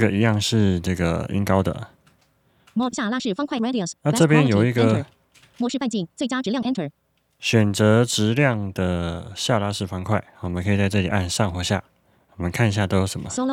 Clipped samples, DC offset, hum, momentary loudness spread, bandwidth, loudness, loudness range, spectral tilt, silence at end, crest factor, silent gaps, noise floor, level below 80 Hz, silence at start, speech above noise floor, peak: under 0.1%; under 0.1%; none; 10 LU; 16 kHz; -22 LUFS; 3 LU; -5.5 dB/octave; 0 s; 20 dB; none; -62 dBFS; -48 dBFS; 0 s; 41 dB; 0 dBFS